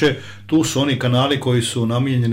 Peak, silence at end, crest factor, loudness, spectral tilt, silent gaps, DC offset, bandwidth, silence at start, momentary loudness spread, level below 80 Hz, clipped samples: -6 dBFS; 0 s; 10 dB; -18 LUFS; -5.5 dB/octave; none; under 0.1%; 16 kHz; 0 s; 3 LU; -50 dBFS; under 0.1%